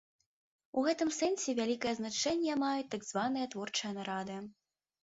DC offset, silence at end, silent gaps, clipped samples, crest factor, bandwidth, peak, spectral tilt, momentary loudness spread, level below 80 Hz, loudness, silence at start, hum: under 0.1%; 0.5 s; none; under 0.1%; 16 dB; 8 kHz; -20 dBFS; -3 dB/octave; 7 LU; -74 dBFS; -35 LUFS; 0.75 s; none